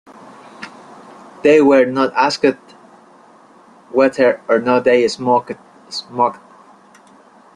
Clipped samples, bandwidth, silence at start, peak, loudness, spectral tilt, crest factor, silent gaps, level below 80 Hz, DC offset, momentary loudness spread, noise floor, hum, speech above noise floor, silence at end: under 0.1%; 10.5 kHz; 0.6 s; 0 dBFS; -15 LUFS; -5 dB/octave; 16 dB; none; -62 dBFS; under 0.1%; 22 LU; -46 dBFS; none; 32 dB; 1.2 s